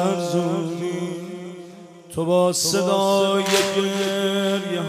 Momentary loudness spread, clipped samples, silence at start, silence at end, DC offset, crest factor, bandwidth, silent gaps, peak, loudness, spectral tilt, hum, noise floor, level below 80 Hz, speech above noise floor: 15 LU; under 0.1%; 0 s; 0 s; under 0.1%; 16 dB; 16 kHz; none; -4 dBFS; -21 LUFS; -4 dB/octave; none; -42 dBFS; -64 dBFS; 21 dB